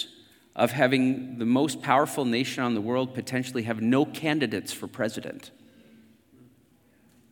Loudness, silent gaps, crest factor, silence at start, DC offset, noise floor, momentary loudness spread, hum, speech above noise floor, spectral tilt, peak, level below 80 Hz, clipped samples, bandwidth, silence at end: -26 LUFS; none; 22 dB; 0 s; under 0.1%; -62 dBFS; 12 LU; none; 36 dB; -5 dB/octave; -4 dBFS; -76 dBFS; under 0.1%; 18 kHz; 1.8 s